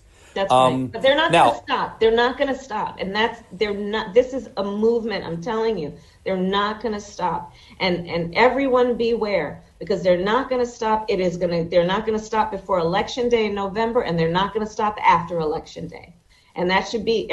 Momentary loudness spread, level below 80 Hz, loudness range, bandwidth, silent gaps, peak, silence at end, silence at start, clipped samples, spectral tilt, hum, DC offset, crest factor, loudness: 10 LU; -48 dBFS; 3 LU; 11.5 kHz; none; -4 dBFS; 0 s; 0.35 s; under 0.1%; -5.5 dB/octave; none; under 0.1%; 18 dB; -21 LUFS